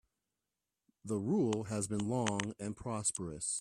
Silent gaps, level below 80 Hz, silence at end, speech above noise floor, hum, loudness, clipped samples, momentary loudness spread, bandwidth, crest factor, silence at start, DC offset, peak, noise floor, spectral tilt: none; -66 dBFS; 0 s; 54 dB; none; -36 LUFS; under 0.1%; 8 LU; 13 kHz; 22 dB; 1.05 s; under 0.1%; -14 dBFS; -90 dBFS; -4.5 dB/octave